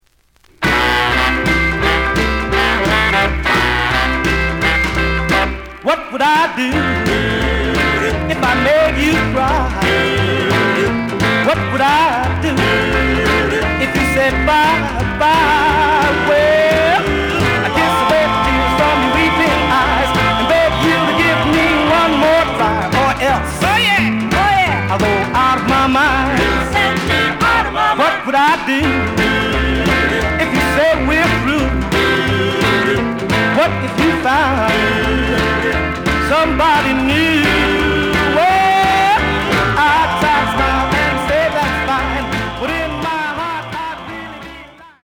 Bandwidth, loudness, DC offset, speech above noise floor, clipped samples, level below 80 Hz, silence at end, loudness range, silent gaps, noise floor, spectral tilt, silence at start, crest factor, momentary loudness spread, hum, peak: over 20 kHz; -13 LUFS; under 0.1%; 39 dB; under 0.1%; -28 dBFS; 0.15 s; 2 LU; none; -53 dBFS; -5 dB/octave; 0.6 s; 14 dB; 4 LU; none; 0 dBFS